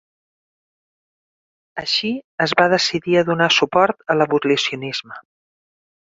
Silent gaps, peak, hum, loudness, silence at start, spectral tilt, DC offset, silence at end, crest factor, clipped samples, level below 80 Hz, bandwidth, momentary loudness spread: 2.24-2.38 s; -2 dBFS; none; -18 LUFS; 1.75 s; -4 dB/octave; under 0.1%; 0.9 s; 18 dB; under 0.1%; -62 dBFS; 7.8 kHz; 11 LU